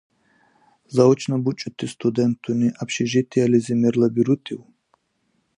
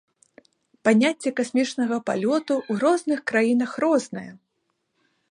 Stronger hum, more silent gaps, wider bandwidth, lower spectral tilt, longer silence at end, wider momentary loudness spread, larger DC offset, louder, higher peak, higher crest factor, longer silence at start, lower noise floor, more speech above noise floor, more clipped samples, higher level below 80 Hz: neither; neither; about the same, 10.5 kHz vs 11 kHz; first, -6.5 dB/octave vs -5 dB/octave; about the same, 0.95 s vs 1 s; first, 9 LU vs 6 LU; neither; about the same, -21 LUFS vs -23 LUFS; about the same, -2 dBFS vs -4 dBFS; about the same, 18 dB vs 20 dB; about the same, 0.9 s vs 0.85 s; second, -69 dBFS vs -75 dBFS; second, 49 dB vs 53 dB; neither; first, -64 dBFS vs -74 dBFS